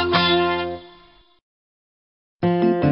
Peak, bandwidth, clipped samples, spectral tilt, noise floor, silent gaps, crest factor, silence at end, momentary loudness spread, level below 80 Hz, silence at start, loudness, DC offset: -6 dBFS; 5.8 kHz; under 0.1%; -4 dB/octave; -52 dBFS; 1.42-2.39 s; 18 dB; 0 s; 12 LU; -52 dBFS; 0 s; -20 LUFS; under 0.1%